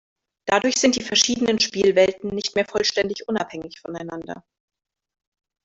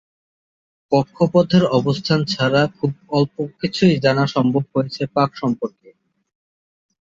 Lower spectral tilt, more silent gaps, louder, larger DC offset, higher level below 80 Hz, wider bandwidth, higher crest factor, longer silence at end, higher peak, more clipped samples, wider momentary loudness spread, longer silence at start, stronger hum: second, -2.5 dB/octave vs -7 dB/octave; neither; about the same, -20 LUFS vs -19 LUFS; neither; about the same, -58 dBFS vs -56 dBFS; about the same, 8 kHz vs 7.8 kHz; about the same, 20 dB vs 18 dB; about the same, 1.25 s vs 1.35 s; about the same, -4 dBFS vs -2 dBFS; neither; first, 16 LU vs 8 LU; second, 0.45 s vs 0.9 s; neither